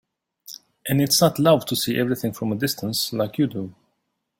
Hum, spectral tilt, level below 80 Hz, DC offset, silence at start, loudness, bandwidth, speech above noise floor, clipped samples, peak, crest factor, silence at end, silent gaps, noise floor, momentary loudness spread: none; -4.5 dB/octave; -58 dBFS; under 0.1%; 0.5 s; -21 LUFS; 17 kHz; 54 dB; under 0.1%; -4 dBFS; 20 dB; 0.7 s; none; -75 dBFS; 19 LU